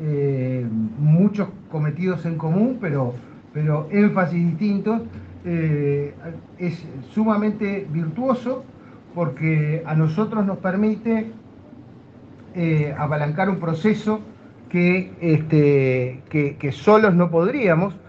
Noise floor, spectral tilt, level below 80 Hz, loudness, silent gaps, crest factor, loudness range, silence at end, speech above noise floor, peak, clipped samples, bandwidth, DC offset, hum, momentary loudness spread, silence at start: -44 dBFS; -9.5 dB/octave; -62 dBFS; -21 LUFS; none; 20 dB; 5 LU; 0.1 s; 23 dB; 0 dBFS; under 0.1%; 7 kHz; under 0.1%; none; 11 LU; 0 s